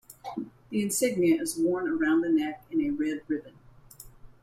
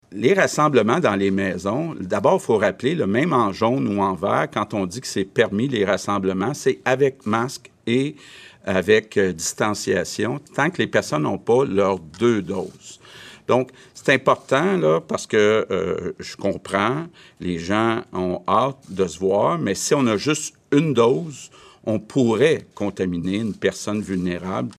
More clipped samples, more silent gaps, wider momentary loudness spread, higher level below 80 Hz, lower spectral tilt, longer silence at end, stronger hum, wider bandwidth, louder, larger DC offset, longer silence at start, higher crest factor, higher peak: neither; neither; first, 13 LU vs 10 LU; about the same, -60 dBFS vs -62 dBFS; about the same, -4.5 dB/octave vs -5 dB/octave; about the same, 0.1 s vs 0.05 s; neither; about the same, 15.5 kHz vs 14.5 kHz; second, -28 LUFS vs -21 LUFS; neither; about the same, 0.1 s vs 0.1 s; about the same, 16 dB vs 18 dB; second, -14 dBFS vs -4 dBFS